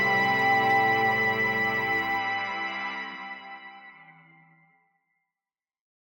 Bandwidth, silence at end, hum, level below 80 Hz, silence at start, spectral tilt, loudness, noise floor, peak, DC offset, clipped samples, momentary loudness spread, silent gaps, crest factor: 16.5 kHz; 1.95 s; none; -64 dBFS; 0 s; -4.5 dB/octave; -24 LUFS; under -90 dBFS; -12 dBFS; under 0.1%; under 0.1%; 18 LU; none; 16 dB